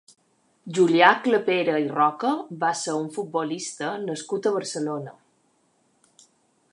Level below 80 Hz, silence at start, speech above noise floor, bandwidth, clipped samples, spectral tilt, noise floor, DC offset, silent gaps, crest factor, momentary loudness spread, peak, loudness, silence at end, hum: -80 dBFS; 0.65 s; 43 dB; 11.5 kHz; under 0.1%; -4 dB/octave; -66 dBFS; under 0.1%; none; 22 dB; 13 LU; -2 dBFS; -23 LUFS; 1.6 s; none